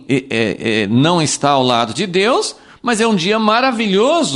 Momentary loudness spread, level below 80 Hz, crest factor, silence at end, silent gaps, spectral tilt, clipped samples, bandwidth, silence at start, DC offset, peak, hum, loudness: 5 LU; -54 dBFS; 14 dB; 0 s; none; -4.5 dB/octave; under 0.1%; 11.5 kHz; 0.1 s; under 0.1%; 0 dBFS; none; -15 LUFS